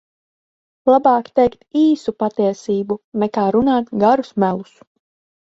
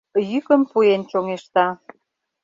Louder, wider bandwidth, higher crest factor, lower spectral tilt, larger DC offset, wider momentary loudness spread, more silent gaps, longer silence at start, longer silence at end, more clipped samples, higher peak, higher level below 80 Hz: about the same, -17 LUFS vs -19 LUFS; about the same, 8 kHz vs 7.6 kHz; about the same, 16 dB vs 18 dB; about the same, -7.5 dB/octave vs -6.5 dB/octave; neither; about the same, 7 LU vs 8 LU; first, 3.04-3.12 s vs none; first, 0.85 s vs 0.15 s; first, 0.95 s vs 0.7 s; neither; about the same, -2 dBFS vs -2 dBFS; first, -54 dBFS vs -68 dBFS